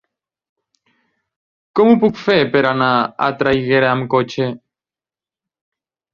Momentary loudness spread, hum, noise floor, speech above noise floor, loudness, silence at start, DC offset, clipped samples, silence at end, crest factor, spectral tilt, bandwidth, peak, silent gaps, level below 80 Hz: 10 LU; none; under -90 dBFS; over 75 dB; -15 LUFS; 1.75 s; under 0.1%; under 0.1%; 1.55 s; 18 dB; -7 dB/octave; 7 kHz; 0 dBFS; none; -54 dBFS